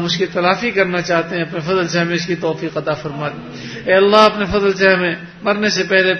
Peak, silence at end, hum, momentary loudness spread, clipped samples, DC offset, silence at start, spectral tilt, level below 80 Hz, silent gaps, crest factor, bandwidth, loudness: 0 dBFS; 0 s; none; 12 LU; under 0.1%; under 0.1%; 0 s; -4.5 dB/octave; -46 dBFS; none; 16 dB; 8.6 kHz; -16 LUFS